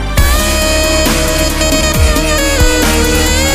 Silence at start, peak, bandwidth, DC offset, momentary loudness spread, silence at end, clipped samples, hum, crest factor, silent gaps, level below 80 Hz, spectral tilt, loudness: 0 s; 0 dBFS; 15.5 kHz; under 0.1%; 1 LU; 0 s; under 0.1%; none; 10 dB; none; -14 dBFS; -3.5 dB/octave; -11 LUFS